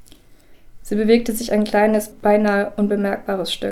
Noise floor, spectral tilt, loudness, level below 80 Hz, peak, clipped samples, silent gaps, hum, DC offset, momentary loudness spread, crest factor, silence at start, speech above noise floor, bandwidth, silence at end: -46 dBFS; -5 dB/octave; -19 LUFS; -44 dBFS; -2 dBFS; under 0.1%; none; none; under 0.1%; 6 LU; 18 dB; 0.3 s; 28 dB; 15 kHz; 0 s